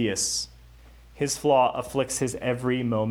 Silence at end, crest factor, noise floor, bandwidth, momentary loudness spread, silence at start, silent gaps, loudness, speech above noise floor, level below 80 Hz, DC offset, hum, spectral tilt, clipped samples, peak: 0 s; 18 dB; -50 dBFS; over 20 kHz; 8 LU; 0 s; none; -25 LUFS; 25 dB; -52 dBFS; under 0.1%; none; -4 dB/octave; under 0.1%; -8 dBFS